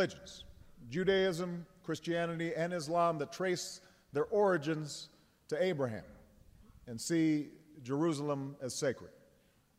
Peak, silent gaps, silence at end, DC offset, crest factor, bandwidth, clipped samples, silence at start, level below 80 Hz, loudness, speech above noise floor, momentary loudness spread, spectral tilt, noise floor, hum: -18 dBFS; none; 0.7 s; under 0.1%; 18 dB; 16 kHz; under 0.1%; 0 s; -68 dBFS; -35 LUFS; 34 dB; 16 LU; -5 dB/octave; -69 dBFS; none